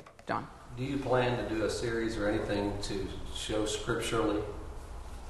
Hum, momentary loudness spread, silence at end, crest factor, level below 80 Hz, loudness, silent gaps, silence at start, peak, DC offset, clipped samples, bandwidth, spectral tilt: none; 12 LU; 0 s; 18 dB; -44 dBFS; -33 LUFS; none; 0 s; -16 dBFS; under 0.1%; under 0.1%; 12.5 kHz; -5 dB/octave